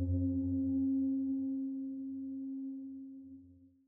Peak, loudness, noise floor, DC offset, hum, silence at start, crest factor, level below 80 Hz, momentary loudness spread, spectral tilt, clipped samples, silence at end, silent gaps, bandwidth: -24 dBFS; -37 LUFS; -60 dBFS; under 0.1%; none; 0 s; 12 dB; -64 dBFS; 17 LU; -16 dB/octave; under 0.1%; 0.2 s; none; 0.9 kHz